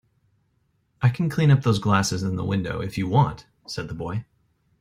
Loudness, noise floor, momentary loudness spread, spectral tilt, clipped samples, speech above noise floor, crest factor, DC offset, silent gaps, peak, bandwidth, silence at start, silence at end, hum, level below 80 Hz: -23 LUFS; -68 dBFS; 14 LU; -6 dB/octave; under 0.1%; 46 dB; 18 dB; under 0.1%; none; -6 dBFS; 15 kHz; 1 s; 0.55 s; none; -50 dBFS